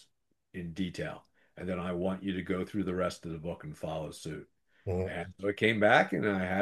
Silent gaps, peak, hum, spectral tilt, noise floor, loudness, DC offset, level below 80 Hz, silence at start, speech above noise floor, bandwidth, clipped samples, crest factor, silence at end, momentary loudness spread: none; -8 dBFS; none; -6 dB/octave; -77 dBFS; -32 LUFS; under 0.1%; -66 dBFS; 0.55 s; 45 dB; 12.5 kHz; under 0.1%; 24 dB; 0 s; 18 LU